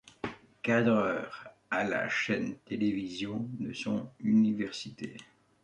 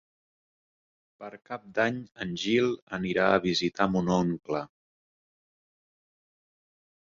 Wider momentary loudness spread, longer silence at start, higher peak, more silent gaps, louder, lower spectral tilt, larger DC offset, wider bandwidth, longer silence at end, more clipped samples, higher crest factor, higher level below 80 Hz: second, 15 LU vs 18 LU; second, 0.25 s vs 1.2 s; second, -14 dBFS vs -8 dBFS; second, none vs 2.82-2.87 s; second, -31 LUFS vs -28 LUFS; about the same, -6 dB/octave vs -5.5 dB/octave; neither; first, 9.2 kHz vs 7.6 kHz; second, 0.4 s vs 2.35 s; neither; about the same, 18 dB vs 22 dB; second, -68 dBFS vs -60 dBFS